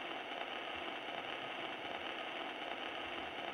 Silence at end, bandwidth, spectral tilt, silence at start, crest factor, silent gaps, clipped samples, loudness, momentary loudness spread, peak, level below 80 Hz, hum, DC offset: 0 s; 19.5 kHz; -3.5 dB/octave; 0 s; 18 dB; none; under 0.1%; -43 LUFS; 1 LU; -26 dBFS; -76 dBFS; none; under 0.1%